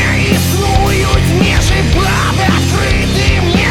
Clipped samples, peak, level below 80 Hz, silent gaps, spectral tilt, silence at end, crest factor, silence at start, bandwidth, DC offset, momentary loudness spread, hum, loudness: under 0.1%; 0 dBFS; -18 dBFS; none; -5 dB/octave; 0 s; 10 dB; 0 s; 17.5 kHz; under 0.1%; 1 LU; none; -11 LUFS